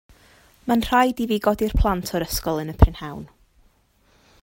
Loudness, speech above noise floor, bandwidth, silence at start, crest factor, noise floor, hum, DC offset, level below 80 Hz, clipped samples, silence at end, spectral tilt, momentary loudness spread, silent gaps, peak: -21 LUFS; 40 dB; 16.5 kHz; 0.65 s; 22 dB; -61 dBFS; none; under 0.1%; -30 dBFS; under 0.1%; 1.15 s; -6 dB/octave; 15 LU; none; 0 dBFS